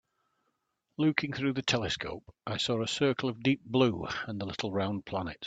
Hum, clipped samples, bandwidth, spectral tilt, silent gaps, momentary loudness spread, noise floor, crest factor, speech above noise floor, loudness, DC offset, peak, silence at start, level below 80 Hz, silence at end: none; under 0.1%; 9.2 kHz; -5 dB/octave; none; 9 LU; -80 dBFS; 26 dB; 49 dB; -31 LUFS; under 0.1%; -6 dBFS; 1 s; -62 dBFS; 0 s